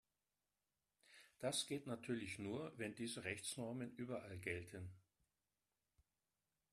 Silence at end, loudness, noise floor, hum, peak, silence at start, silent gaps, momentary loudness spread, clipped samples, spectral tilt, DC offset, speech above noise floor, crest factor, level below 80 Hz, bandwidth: 1.7 s; -48 LUFS; under -90 dBFS; none; -28 dBFS; 1.1 s; none; 12 LU; under 0.1%; -4 dB/octave; under 0.1%; over 42 dB; 22 dB; -82 dBFS; 13.5 kHz